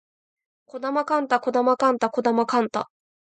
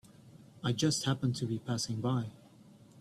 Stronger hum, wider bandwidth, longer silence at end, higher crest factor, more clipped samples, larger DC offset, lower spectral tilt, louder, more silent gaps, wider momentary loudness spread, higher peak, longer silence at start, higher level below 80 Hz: neither; second, 9 kHz vs 13 kHz; first, 0.5 s vs 0 s; about the same, 18 dB vs 18 dB; neither; neither; about the same, -5 dB/octave vs -5 dB/octave; first, -23 LUFS vs -33 LUFS; neither; first, 11 LU vs 6 LU; first, -6 dBFS vs -18 dBFS; first, 0.75 s vs 0.25 s; second, -76 dBFS vs -66 dBFS